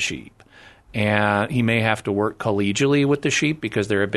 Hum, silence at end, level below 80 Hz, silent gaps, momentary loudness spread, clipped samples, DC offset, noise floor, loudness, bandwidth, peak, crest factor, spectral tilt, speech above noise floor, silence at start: none; 0 s; -52 dBFS; none; 6 LU; under 0.1%; under 0.1%; -49 dBFS; -21 LUFS; 12.5 kHz; -2 dBFS; 20 dB; -5 dB/octave; 28 dB; 0 s